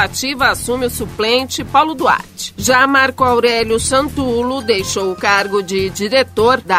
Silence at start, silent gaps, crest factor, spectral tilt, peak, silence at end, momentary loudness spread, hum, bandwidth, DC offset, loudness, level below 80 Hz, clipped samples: 0 s; none; 14 dB; -3 dB/octave; 0 dBFS; 0 s; 7 LU; none; 16 kHz; under 0.1%; -14 LUFS; -38 dBFS; under 0.1%